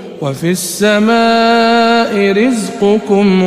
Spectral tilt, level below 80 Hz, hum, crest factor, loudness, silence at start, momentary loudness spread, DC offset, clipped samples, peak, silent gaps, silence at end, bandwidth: -5 dB/octave; -50 dBFS; none; 10 dB; -11 LUFS; 0 s; 6 LU; under 0.1%; under 0.1%; 0 dBFS; none; 0 s; 15.5 kHz